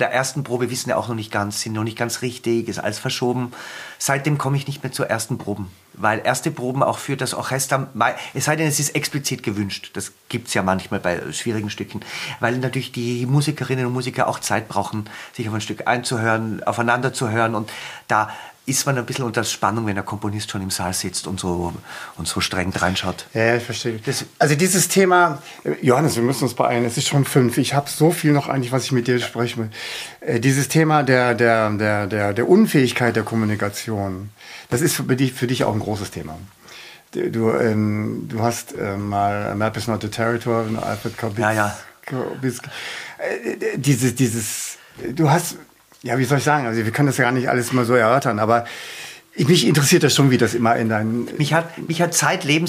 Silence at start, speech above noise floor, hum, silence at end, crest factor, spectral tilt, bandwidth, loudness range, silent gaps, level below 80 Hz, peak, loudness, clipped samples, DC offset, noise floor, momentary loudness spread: 0 s; 21 dB; none; 0 s; 18 dB; -4.5 dB/octave; 15.5 kHz; 6 LU; none; -56 dBFS; -2 dBFS; -20 LUFS; under 0.1%; under 0.1%; -42 dBFS; 12 LU